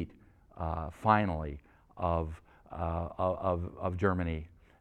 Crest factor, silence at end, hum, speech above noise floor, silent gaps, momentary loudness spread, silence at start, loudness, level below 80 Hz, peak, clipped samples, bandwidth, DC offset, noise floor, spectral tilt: 24 dB; 0.3 s; none; 26 dB; none; 16 LU; 0 s; -33 LUFS; -46 dBFS; -10 dBFS; under 0.1%; 8.8 kHz; under 0.1%; -59 dBFS; -9 dB/octave